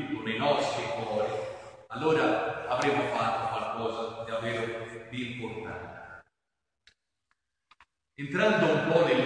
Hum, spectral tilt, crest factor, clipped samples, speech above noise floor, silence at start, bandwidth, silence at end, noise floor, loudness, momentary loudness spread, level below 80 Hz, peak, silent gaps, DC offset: none; -5.5 dB/octave; 20 dB; under 0.1%; 58 dB; 0 s; 10.5 kHz; 0 s; -86 dBFS; -29 LUFS; 16 LU; -66 dBFS; -10 dBFS; none; under 0.1%